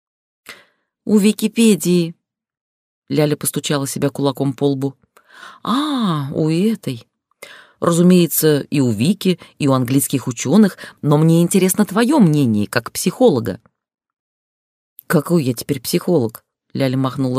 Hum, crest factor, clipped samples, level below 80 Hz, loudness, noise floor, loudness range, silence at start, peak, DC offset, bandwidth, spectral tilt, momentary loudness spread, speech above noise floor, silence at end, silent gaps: none; 16 dB; under 0.1%; -60 dBFS; -17 LUFS; -54 dBFS; 6 LU; 0.5 s; -2 dBFS; under 0.1%; 16 kHz; -5.5 dB/octave; 9 LU; 38 dB; 0 s; 2.61-3.02 s, 14.19-14.96 s